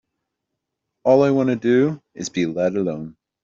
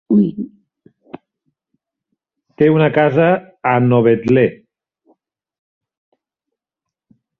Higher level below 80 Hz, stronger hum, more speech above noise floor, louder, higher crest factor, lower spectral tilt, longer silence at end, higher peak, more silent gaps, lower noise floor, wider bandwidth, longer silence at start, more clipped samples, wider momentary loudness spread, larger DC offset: second, -62 dBFS vs -56 dBFS; neither; second, 61 dB vs 71 dB; second, -20 LUFS vs -14 LUFS; about the same, 18 dB vs 16 dB; second, -6.5 dB/octave vs -10 dB/octave; second, 0.35 s vs 2.85 s; about the same, -4 dBFS vs -2 dBFS; neither; second, -80 dBFS vs -84 dBFS; first, 7.4 kHz vs 6.2 kHz; first, 1.05 s vs 0.1 s; neither; first, 14 LU vs 7 LU; neither